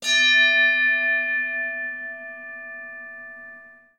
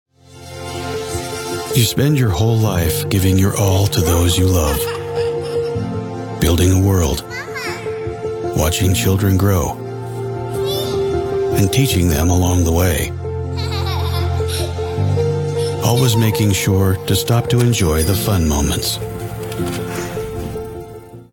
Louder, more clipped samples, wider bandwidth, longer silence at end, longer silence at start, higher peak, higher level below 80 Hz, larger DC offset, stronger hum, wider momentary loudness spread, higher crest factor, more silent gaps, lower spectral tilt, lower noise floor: about the same, -18 LUFS vs -17 LUFS; neither; second, 14 kHz vs 17 kHz; first, 0.25 s vs 0.1 s; second, 0 s vs 0.3 s; second, -8 dBFS vs 0 dBFS; second, -76 dBFS vs -32 dBFS; neither; neither; first, 22 LU vs 10 LU; about the same, 16 dB vs 16 dB; neither; second, 2 dB/octave vs -5.5 dB/octave; first, -46 dBFS vs -37 dBFS